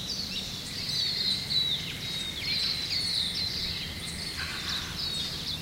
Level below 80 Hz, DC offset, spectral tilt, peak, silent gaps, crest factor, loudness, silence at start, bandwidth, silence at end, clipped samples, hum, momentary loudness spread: -50 dBFS; under 0.1%; -2 dB/octave; -16 dBFS; none; 16 dB; -29 LUFS; 0 s; 16 kHz; 0 s; under 0.1%; none; 7 LU